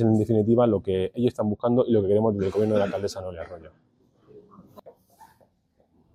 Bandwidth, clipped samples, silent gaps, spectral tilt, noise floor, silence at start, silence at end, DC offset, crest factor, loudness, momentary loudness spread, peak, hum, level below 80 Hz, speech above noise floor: 12 kHz; under 0.1%; none; -8.5 dB/octave; -66 dBFS; 0 s; 0.9 s; under 0.1%; 16 dB; -23 LUFS; 15 LU; -10 dBFS; none; -60 dBFS; 43 dB